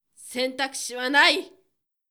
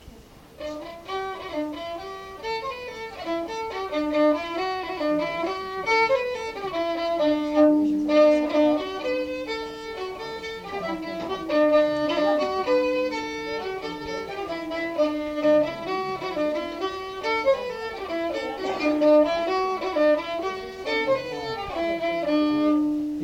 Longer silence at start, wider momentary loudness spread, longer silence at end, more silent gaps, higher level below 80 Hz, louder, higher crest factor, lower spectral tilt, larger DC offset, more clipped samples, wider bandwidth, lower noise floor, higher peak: first, 0.2 s vs 0 s; about the same, 11 LU vs 13 LU; first, 0.6 s vs 0 s; neither; second, -80 dBFS vs -54 dBFS; first, -22 LUFS vs -25 LUFS; about the same, 22 dB vs 18 dB; second, 0.5 dB/octave vs -5 dB/octave; neither; neither; first, over 20 kHz vs 15.5 kHz; first, -73 dBFS vs -48 dBFS; first, -4 dBFS vs -8 dBFS